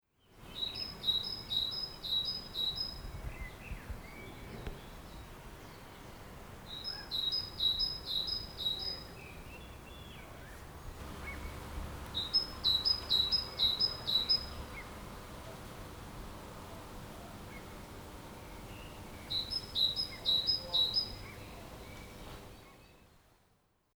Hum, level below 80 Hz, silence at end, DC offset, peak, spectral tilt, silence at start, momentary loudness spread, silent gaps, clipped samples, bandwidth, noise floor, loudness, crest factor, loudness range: none; -52 dBFS; 0.75 s; under 0.1%; -18 dBFS; -3 dB/octave; 0.3 s; 21 LU; none; under 0.1%; over 20 kHz; -73 dBFS; -33 LUFS; 20 dB; 17 LU